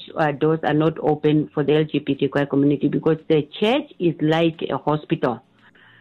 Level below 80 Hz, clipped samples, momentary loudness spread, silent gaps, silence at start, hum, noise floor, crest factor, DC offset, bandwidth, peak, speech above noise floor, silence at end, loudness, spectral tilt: -56 dBFS; under 0.1%; 4 LU; none; 0 s; none; -52 dBFS; 14 dB; under 0.1%; 7.2 kHz; -6 dBFS; 32 dB; 0.6 s; -21 LUFS; -8.5 dB/octave